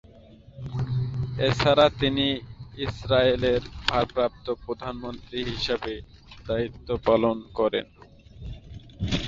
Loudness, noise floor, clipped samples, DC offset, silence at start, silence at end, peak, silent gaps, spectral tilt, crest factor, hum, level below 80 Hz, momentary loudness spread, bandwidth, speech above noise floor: -26 LUFS; -50 dBFS; under 0.1%; under 0.1%; 0.15 s; 0 s; -4 dBFS; none; -6 dB/octave; 22 dB; none; -44 dBFS; 20 LU; 7.8 kHz; 25 dB